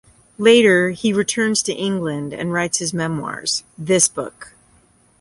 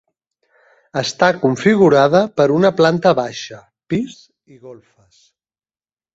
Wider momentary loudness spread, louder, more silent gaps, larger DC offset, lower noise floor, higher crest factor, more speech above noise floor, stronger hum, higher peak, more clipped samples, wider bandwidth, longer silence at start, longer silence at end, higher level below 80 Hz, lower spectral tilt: second, 11 LU vs 14 LU; second, -18 LUFS vs -15 LUFS; neither; neither; second, -55 dBFS vs under -90 dBFS; about the same, 18 dB vs 16 dB; second, 37 dB vs over 74 dB; neither; about the same, -2 dBFS vs -2 dBFS; neither; first, 11.5 kHz vs 8 kHz; second, 0.4 s vs 0.95 s; second, 0.7 s vs 1.4 s; about the same, -58 dBFS vs -58 dBFS; second, -3.5 dB/octave vs -6 dB/octave